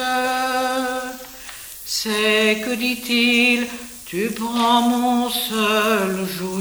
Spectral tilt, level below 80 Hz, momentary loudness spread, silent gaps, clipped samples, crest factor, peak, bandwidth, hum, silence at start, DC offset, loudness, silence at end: -3 dB/octave; -54 dBFS; 15 LU; none; under 0.1%; 16 dB; -4 dBFS; over 20 kHz; none; 0 s; under 0.1%; -19 LUFS; 0 s